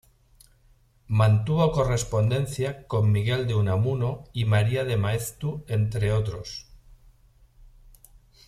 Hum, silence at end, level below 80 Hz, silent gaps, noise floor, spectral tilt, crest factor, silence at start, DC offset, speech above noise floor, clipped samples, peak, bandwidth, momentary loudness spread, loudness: none; 1.85 s; -46 dBFS; none; -60 dBFS; -6.5 dB/octave; 18 dB; 1.1 s; under 0.1%; 36 dB; under 0.1%; -8 dBFS; 14 kHz; 9 LU; -25 LUFS